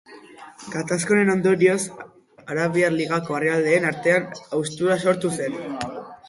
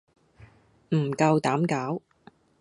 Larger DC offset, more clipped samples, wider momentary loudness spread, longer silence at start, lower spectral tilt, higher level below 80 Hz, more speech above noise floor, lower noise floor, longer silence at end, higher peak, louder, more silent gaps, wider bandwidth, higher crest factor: neither; neither; about the same, 12 LU vs 10 LU; second, 0.1 s vs 0.4 s; second, -5 dB/octave vs -7 dB/octave; about the same, -64 dBFS vs -66 dBFS; second, 22 dB vs 33 dB; second, -44 dBFS vs -57 dBFS; second, 0.15 s vs 0.65 s; first, -4 dBFS vs -8 dBFS; first, -22 LUFS vs -26 LUFS; neither; about the same, 11.5 kHz vs 11.5 kHz; about the same, 18 dB vs 20 dB